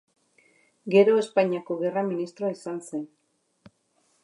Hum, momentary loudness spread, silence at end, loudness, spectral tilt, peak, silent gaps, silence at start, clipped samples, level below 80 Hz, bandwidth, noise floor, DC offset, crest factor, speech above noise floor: none; 16 LU; 1.15 s; -25 LUFS; -6.5 dB/octave; -8 dBFS; none; 0.85 s; under 0.1%; -80 dBFS; 11.5 kHz; -69 dBFS; under 0.1%; 20 dB; 45 dB